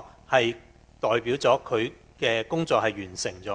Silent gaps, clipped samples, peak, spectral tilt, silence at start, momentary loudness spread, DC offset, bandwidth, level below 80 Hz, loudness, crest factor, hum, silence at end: none; under 0.1%; -6 dBFS; -4 dB/octave; 0 s; 9 LU; under 0.1%; 10 kHz; -56 dBFS; -26 LUFS; 20 dB; none; 0 s